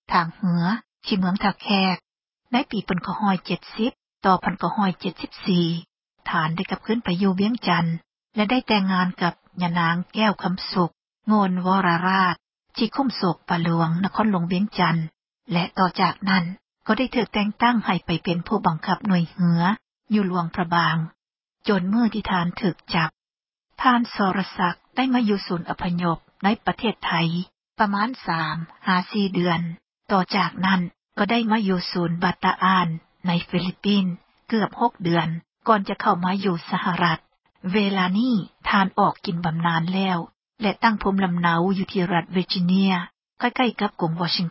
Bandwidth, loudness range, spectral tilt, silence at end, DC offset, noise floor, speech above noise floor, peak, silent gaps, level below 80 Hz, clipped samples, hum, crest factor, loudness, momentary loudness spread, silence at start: 5.8 kHz; 2 LU; -10 dB/octave; 0 s; under 0.1%; under -90 dBFS; over 68 dB; -4 dBFS; none; -54 dBFS; under 0.1%; none; 18 dB; -23 LUFS; 7 LU; 0.1 s